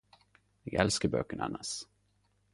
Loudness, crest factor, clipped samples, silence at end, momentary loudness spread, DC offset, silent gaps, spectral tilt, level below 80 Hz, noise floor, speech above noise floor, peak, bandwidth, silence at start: -33 LUFS; 24 dB; under 0.1%; 0.7 s; 16 LU; under 0.1%; none; -4 dB/octave; -56 dBFS; -73 dBFS; 40 dB; -12 dBFS; 11.5 kHz; 0.65 s